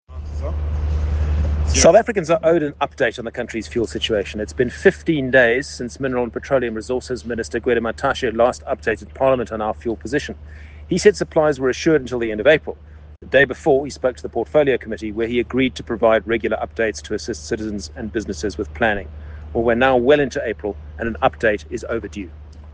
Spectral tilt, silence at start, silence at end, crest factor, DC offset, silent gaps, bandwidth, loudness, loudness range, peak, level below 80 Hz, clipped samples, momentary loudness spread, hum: -5 dB/octave; 0.1 s; 0 s; 20 dB; under 0.1%; none; 9.8 kHz; -20 LUFS; 3 LU; 0 dBFS; -34 dBFS; under 0.1%; 11 LU; none